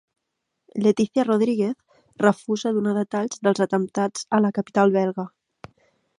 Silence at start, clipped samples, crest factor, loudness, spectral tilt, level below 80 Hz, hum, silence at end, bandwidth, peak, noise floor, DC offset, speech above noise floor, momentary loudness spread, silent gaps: 0.75 s; under 0.1%; 20 dB; -22 LUFS; -6 dB/octave; -70 dBFS; none; 0.9 s; 11 kHz; -4 dBFS; -79 dBFS; under 0.1%; 58 dB; 7 LU; none